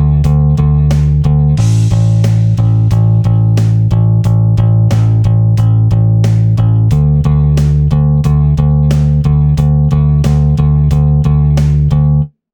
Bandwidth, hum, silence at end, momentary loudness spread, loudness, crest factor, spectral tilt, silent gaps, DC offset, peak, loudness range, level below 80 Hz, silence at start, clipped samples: 8.6 kHz; none; 0.25 s; 1 LU; -10 LUFS; 8 dB; -9 dB/octave; none; under 0.1%; 0 dBFS; 0 LU; -18 dBFS; 0 s; under 0.1%